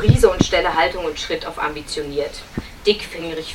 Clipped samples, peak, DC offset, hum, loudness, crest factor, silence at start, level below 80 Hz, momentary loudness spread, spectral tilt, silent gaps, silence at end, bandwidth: under 0.1%; 0 dBFS; under 0.1%; none; -20 LUFS; 20 dB; 0 s; -34 dBFS; 13 LU; -5 dB/octave; none; 0 s; 16 kHz